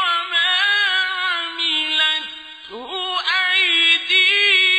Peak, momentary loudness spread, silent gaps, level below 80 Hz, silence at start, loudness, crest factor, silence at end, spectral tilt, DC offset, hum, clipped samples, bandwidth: -4 dBFS; 15 LU; none; -66 dBFS; 0 s; -16 LUFS; 14 dB; 0 s; 1.5 dB/octave; under 0.1%; none; under 0.1%; 15 kHz